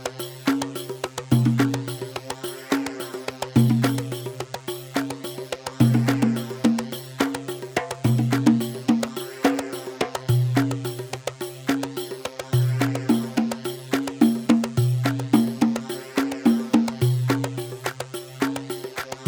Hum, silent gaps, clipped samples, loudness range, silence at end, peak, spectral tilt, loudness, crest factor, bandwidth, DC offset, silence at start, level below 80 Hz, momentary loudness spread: none; none; under 0.1%; 3 LU; 0 s; -4 dBFS; -6 dB/octave; -24 LUFS; 20 dB; over 20 kHz; under 0.1%; 0 s; -58 dBFS; 12 LU